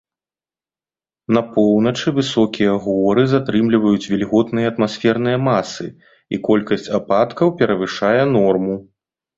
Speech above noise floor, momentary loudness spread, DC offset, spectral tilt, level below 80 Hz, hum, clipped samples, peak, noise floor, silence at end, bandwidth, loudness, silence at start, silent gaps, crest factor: over 74 dB; 7 LU; under 0.1%; -6.5 dB/octave; -54 dBFS; none; under 0.1%; -2 dBFS; under -90 dBFS; 0.55 s; 7.8 kHz; -17 LUFS; 1.3 s; none; 16 dB